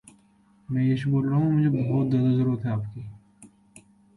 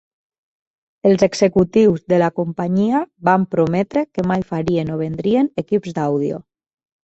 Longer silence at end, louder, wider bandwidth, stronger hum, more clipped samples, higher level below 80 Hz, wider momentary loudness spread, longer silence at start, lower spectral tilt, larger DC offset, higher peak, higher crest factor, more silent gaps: about the same, 0.7 s vs 0.7 s; second, -24 LUFS vs -18 LUFS; first, 11 kHz vs 8.2 kHz; neither; neither; second, -58 dBFS vs -50 dBFS; first, 12 LU vs 7 LU; second, 0.7 s vs 1.05 s; first, -9.5 dB/octave vs -7 dB/octave; neither; second, -14 dBFS vs -2 dBFS; about the same, 12 dB vs 16 dB; neither